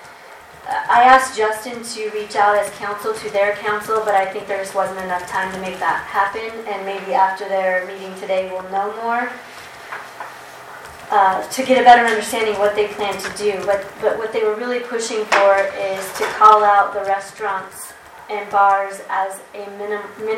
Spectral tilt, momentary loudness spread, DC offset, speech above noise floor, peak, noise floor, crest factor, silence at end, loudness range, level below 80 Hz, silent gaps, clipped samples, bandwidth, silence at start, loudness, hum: -2.5 dB/octave; 19 LU; under 0.1%; 22 dB; 0 dBFS; -40 dBFS; 18 dB; 0 s; 6 LU; -58 dBFS; none; under 0.1%; 16 kHz; 0 s; -18 LUFS; none